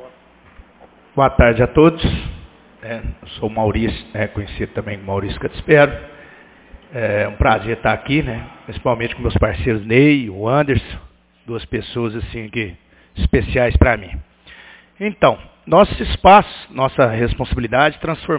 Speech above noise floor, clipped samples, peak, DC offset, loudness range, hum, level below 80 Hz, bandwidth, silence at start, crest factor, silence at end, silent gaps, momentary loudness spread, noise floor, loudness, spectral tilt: 31 dB; under 0.1%; 0 dBFS; under 0.1%; 6 LU; none; -28 dBFS; 4 kHz; 0 s; 18 dB; 0 s; none; 16 LU; -47 dBFS; -17 LUFS; -10.5 dB/octave